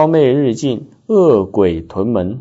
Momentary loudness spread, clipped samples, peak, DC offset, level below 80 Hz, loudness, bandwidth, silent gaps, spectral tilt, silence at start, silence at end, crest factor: 9 LU; under 0.1%; -2 dBFS; under 0.1%; -44 dBFS; -14 LUFS; 8 kHz; none; -7.5 dB/octave; 0 s; 0 s; 12 dB